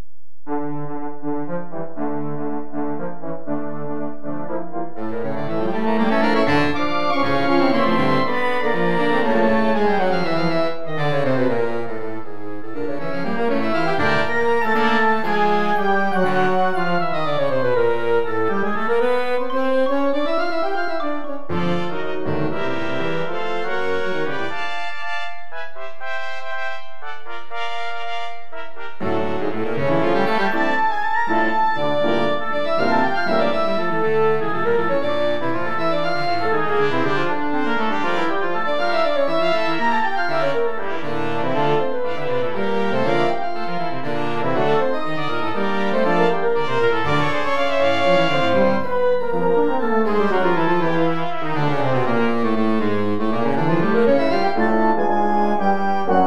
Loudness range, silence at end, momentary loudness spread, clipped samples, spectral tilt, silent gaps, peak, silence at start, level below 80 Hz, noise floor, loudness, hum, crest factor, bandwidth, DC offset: 9 LU; 0 s; 10 LU; under 0.1%; -6.5 dB/octave; none; -4 dBFS; 0.45 s; -56 dBFS; -43 dBFS; -21 LUFS; none; 16 dB; 13.5 kHz; 9%